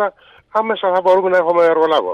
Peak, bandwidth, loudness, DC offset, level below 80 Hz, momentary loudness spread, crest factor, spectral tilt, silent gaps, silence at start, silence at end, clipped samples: -4 dBFS; 7 kHz; -15 LUFS; under 0.1%; -64 dBFS; 8 LU; 10 dB; -5.5 dB/octave; none; 0 s; 0 s; under 0.1%